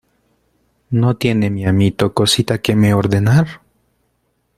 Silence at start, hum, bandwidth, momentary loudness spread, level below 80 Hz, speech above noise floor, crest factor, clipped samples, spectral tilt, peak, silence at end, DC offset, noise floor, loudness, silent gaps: 0.9 s; none; 15 kHz; 4 LU; -46 dBFS; 51 dB; 16 dB; under 0.1%; -6 dB/octave; 0 dBFS; 1 s; under 0.1%; -65 dBFS; -15 LUFS; none